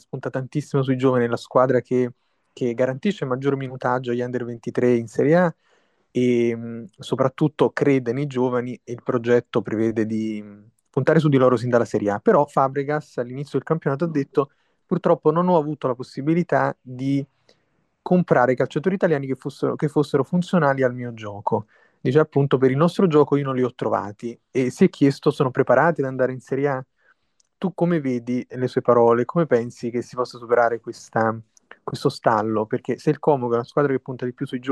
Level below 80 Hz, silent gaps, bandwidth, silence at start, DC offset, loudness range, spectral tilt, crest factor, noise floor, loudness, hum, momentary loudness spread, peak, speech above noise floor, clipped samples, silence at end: -66 dBFS; none; 12 kHz; 0.15 s; under 0.1%; 3 LU; -7.5 dB/octave; 18 dB; -68 dBFS; -22 LUFS; none; 11 LU; -4 dBFS; 47 dB; under 0.1%; 0 s